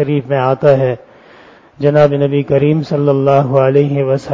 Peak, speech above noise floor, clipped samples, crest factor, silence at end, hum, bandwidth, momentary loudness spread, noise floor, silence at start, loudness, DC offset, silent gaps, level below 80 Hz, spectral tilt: 0 dBFS; 30 dB; under 0.1%; 12 dB; 0 s; none; 7.4 kHz; 4 LU; -41 dBFS; 0 s; -12 LUFS; under 0.1%; none; -50 dBFS; -9 dB/octave